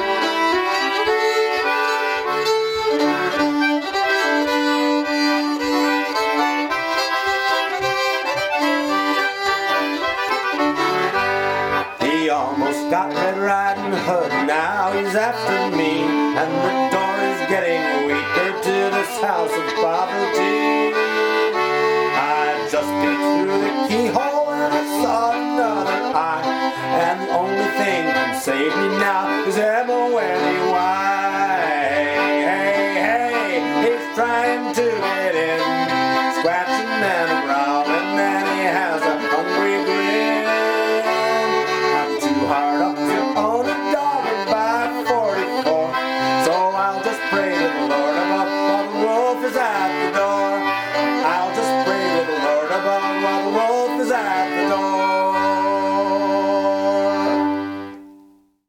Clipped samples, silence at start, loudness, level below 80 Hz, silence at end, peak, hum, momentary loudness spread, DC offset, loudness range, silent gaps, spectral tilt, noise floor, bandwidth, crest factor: under 0.1%; 0 s; -19 LUFS; -60 dBFS; 0.5 s; -4 dBFS; none; 2 LU; under 0.1%; 1 LU; none; -4 dB/octave; -51 dBFS; 18.5 kHz; 16 dB